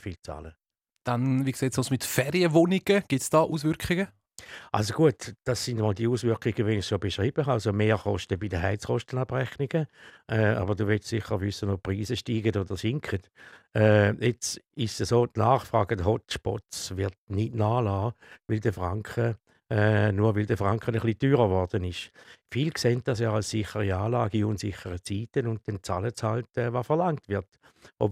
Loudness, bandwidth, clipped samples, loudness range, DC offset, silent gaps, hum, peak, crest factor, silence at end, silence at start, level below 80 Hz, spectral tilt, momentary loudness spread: -27 LUFS; 16 kHz; under 0.1%; 4 LU; under 0.1%; 17.18-17.27 s; none; -6 dBFS; 20 dB; 0 s; 0.05 s; -56 dBFS; -6 dB/octave; 10 LU